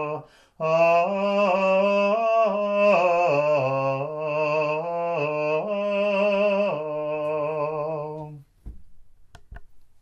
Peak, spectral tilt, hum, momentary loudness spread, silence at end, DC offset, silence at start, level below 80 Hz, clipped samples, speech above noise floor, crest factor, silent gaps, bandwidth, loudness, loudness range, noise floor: -8 dBFS; -6.5 dB/octave; none; 9 LU; 0.15 s; under 0.1%; 0 s; -54 dBFS; under 0.1%; 26 dB; 14 dB; none; 7.6 kHz; -23 LUFS; 7 LU; -48 dBFS